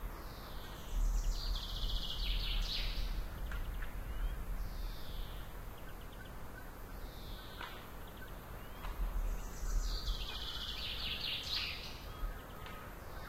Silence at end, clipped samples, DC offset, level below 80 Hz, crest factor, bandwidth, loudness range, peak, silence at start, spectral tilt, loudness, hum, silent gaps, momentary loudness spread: 0 s; under 0.1%; under 0.1%; -42 dBFS; 16 dB; 16 kHz; 9 LU; -24 dBFS; 0 s; -3.5 dB/octave; -43 LUFS; none; none; 12 LU